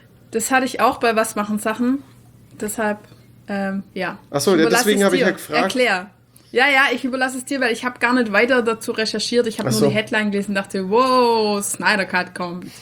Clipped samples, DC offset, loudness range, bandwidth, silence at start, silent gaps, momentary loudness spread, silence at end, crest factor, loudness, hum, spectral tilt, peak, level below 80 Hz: under 0.1%; under 0.1%; 5 LU; over 20 kHz; 0.3 s; none; 11 LU; 0 s; 18 dB; -19 LUFS; none; -4 dB/octave; -2 dBFS; -58 dBFS